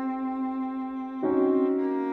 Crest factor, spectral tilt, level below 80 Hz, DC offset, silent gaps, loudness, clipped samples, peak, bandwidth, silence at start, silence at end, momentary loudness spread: 14 dB; -9 dB/octave; -66 dBFS; under 0.1%; none; -27 LUFS; under 0.1%; -14 dBFS; 4.2 kHz; 0 s; 0 s; 9 LU